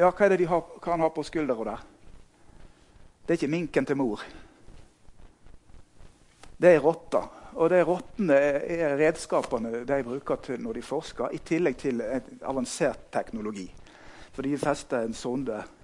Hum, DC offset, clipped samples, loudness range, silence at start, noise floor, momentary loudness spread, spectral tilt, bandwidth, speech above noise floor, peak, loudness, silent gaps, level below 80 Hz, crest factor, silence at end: none; under 0.1%; under 0.1%; 7 LU; 0 s; -54 dBFS; 13 LU; -6 dB/octave; 11.5 kHz; 27 dB; -6 dBFS; -27 LUFS; none; -54 dBFS; 22 dB; 0.15 s